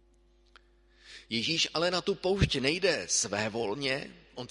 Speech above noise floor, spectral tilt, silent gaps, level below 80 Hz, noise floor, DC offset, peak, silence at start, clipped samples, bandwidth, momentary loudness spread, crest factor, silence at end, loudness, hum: 34 dB; -3 dB/octave; none; -48 dBFS; -64 dBFS; under 0.1%; -10 dBFS; 1.05 s; under 0.1%; 11.5 kHz; 15 LU; 22 dB; 0.05 s; -29 LUFS; none